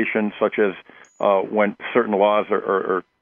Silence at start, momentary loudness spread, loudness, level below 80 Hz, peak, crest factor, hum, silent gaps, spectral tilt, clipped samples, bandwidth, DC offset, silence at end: 0 s; 6 LU; -20 LUFS; -72 dBFS; -4 dBFS; 18 dB; none; none; -7.5 dB/octave; under 0.1%; 7.2 kHz; under 0.1%; 0.2 s